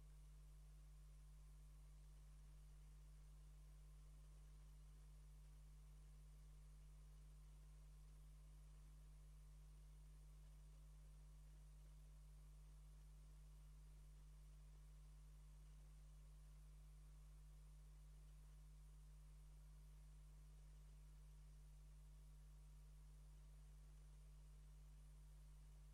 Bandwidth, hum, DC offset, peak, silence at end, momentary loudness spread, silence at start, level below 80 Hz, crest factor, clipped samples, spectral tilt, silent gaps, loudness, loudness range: 12.5 kHz; 50 Hz at -65 dBFS; under 0.1%; -56 dBFS; 0 s; 0 LU; 0 s; -64 dBFS; 6 dB; under 0.1%; -5.5 dB/octave; none; -67 LUFS; 0 LU